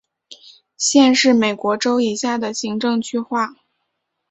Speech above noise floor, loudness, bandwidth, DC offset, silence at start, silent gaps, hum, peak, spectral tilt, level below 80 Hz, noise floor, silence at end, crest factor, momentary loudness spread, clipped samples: 57 dB; -17 LUFS; 8.4 kHz; under 0.1%; 0.3 s; none; none; -2 dBFS; -3 dB/octave; -64 dBFS; -74 dBFS; 0.8 s; 18 dB; 10 LU; under 0.1%